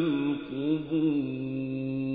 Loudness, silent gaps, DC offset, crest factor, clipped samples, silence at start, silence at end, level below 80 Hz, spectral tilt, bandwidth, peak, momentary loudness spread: -30 LUFS; none; under 0.1%; 12 dB; under 0.1%; 0 s; 0 s; -64 dBFS; -11 dB/octave; 4.6 kHz; -16 dBFS; 6 LU